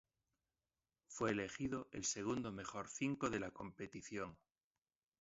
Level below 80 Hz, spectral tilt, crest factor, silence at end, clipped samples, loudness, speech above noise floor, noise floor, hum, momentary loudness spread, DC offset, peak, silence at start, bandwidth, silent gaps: -70 dBFS; -4.5 dB/octave; 20 dB; 0.85 s; under 0.1%; -44 LUFS; over 46 dB; under -90 dBFS; none; 10 LU; under 0.1%; -26 dBFS; 1.1 s; 7.6 kHz; none